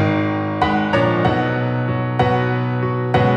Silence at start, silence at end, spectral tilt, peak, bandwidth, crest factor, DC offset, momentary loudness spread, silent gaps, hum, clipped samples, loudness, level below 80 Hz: 0 s; 0 s; -8 dB/octave; -4 dBFS; 7.4 kHz; 14 dB; under 0.1%; 4 LU; none; none; under 0.1%; -18 LUFS; -42 dBFS